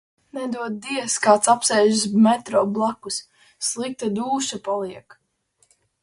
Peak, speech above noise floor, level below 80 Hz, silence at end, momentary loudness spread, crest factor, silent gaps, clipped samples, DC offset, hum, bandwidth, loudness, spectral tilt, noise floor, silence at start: -2 dBFS; 45 dB; -68 dBFS; 1.05 s; 13 LU; 20 dB; none; under 0.1%; under 0.1%; none; 11.5 kHz; -21 LUFS; -3.5 dB/octave; -66 dBFS; 0.35 s